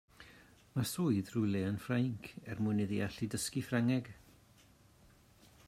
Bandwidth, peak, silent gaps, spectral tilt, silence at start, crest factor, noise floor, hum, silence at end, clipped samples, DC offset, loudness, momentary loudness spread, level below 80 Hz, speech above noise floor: 16 kHz; -20 dBFS; none; -6 dB/octave; 0.2 s; 18 dB; -64 dBFS; none; 1.5 s; under 0.1%; under 0.1%; -36 LUFS; 13 LU; -68 dBFS; 29 dB